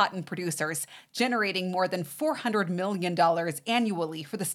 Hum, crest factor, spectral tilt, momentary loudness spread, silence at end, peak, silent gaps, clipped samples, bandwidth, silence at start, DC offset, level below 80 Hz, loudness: none; 18 dB; -4 dB/octave; 8 LU; 0 s; -10 dBFS; none; under 0.1%; 17 kHz; 0 s; under 0.1%; -84 dBFS; -28 LUFS